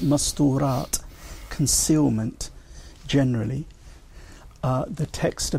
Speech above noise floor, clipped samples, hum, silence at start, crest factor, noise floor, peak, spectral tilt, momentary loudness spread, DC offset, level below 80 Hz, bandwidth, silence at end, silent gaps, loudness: 22 dB; under 0.1%; none; 0 s; 16 dB; -44 dBFS; -8 dBFS; -5 dB/octave; 17 LU; under 0.1%; -40 dBFS; 16 kHz; 0 s; none; -24 LUFS